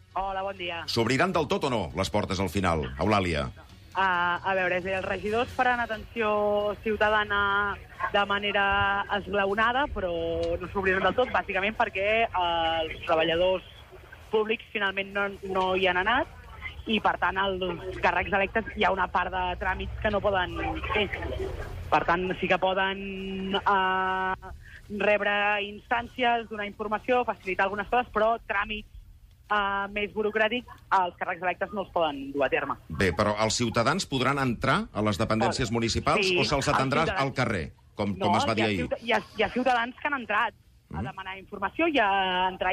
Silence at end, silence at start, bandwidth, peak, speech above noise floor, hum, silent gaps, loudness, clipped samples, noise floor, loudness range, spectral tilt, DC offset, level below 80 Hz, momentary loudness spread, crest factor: 0 s; 0.15 s; 15.5 kHz; -12 dBFS; 25 dB; none; none; -27 LUFS; under 0.1%; -52 dBFS; 3 LU; -4.5 dB/octave; under 0.1%; -46 dBFS; 8 LU; 16 dB